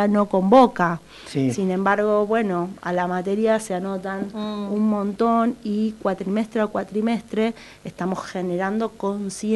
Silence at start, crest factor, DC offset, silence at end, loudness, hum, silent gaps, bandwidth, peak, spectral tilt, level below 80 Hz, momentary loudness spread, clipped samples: 0 s; 18 dB; under 0.1%; 0 s; -22 LUFS; none; none; 12 kHz; -4 dBFS; -6.5 dB/octave; -56 dBFS; 9 LU; under 0.1%